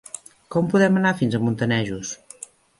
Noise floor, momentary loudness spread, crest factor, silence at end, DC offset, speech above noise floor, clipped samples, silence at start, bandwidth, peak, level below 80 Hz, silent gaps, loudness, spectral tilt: -44 dBFS; 20 LU; 18 dB; 0.65 s; under 0.1%; 23 dB; under 0.1%; 0.15 s; 11.5 kHz; -6 dBFS; -56 dBFS; none; -21 LUFS; -5.5 dB/octave